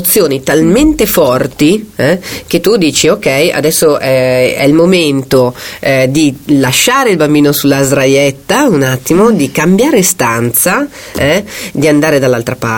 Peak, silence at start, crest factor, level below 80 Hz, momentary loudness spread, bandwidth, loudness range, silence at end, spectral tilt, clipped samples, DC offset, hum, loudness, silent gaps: 0 dBFS; 0 s; 8 dB; -36 dBFS; 5 LU; over 20 kHz; 1 LU; 0 s; -4.5 dB/octave; 0.2%; under 0.1%; none; -9 LUFS; none